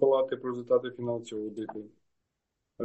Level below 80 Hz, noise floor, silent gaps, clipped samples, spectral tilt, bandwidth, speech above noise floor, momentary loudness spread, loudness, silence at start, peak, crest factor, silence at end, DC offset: -76 dBFS; -83 dBFS; none; under 0.1%; -6.5 dB/octave; 8.4 kHz; 52 dB; 14 LU; -31 LUFS; 0 s; -12 dBFS; 20 dB; 0 s; under 0.1%